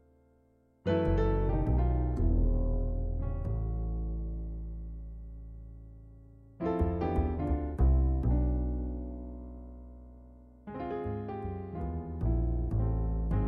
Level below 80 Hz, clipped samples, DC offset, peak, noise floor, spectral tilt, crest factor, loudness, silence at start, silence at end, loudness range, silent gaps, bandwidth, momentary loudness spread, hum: -34 dBFS; under 0.1%; under 0.1%; -16 dBFS; -66 dBFS; -10.5 dB/octave; 14 dB; -33 LUFS; 0.85 s; 0 s; 8 LU; none; 4.3 kHz; 19 LU; none